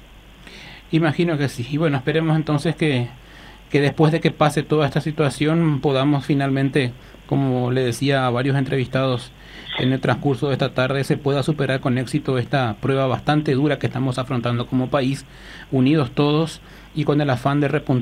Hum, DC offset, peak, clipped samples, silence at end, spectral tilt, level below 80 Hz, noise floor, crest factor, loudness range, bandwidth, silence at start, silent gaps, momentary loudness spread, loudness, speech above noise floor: none; under 0.1%; -4 dBFS; under 0.1%; 0 s; -7 dB/octave; -48 dBFS; -43 dBFS; 16 dB; 2 LU; 13.5 kHz; 0.4 s; none; 7 LU; -20 LUFS; 24 dB